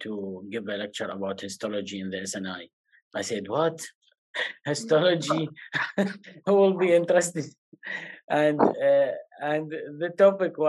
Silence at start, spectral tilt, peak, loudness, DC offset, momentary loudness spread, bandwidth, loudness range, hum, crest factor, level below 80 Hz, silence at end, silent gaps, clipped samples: 0 s; -4.5 dB/octave; -6 dBFS; -26 LUFS; under 0.1%; 15 LU; 12.5 kHz; 8 LU; none; 20 dB; -82 dBFS; 0 s; 2.73-2.84 s, 3.02-3.11 s, 3.95-4.01 s, 4.18-4.34 s, 7.58-7.72 s, 8.24-8.28 s; under 0.1%